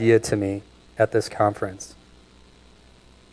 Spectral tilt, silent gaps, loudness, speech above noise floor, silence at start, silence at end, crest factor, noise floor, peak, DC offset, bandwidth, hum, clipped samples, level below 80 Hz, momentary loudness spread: -6 dB/octave; none; -24 LUFS; 30 dB; 0 s; 1.45 s; 20 dB; -52 dBFS; -4 dBFS; under 0.1%; 11 kHz; 60 Hz at -55 dBFS; under 0.1%; -54 dBFS; 20 LU